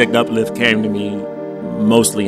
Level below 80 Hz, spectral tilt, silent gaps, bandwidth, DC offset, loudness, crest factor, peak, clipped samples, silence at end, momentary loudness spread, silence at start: -54 dBFS; -4 dB/octave; none; 15.5 kHz; under 0.1%; -16 LUFS; 16 dB; 0 dBFS; under 0.1%; 0 s; 12 LU; 0 s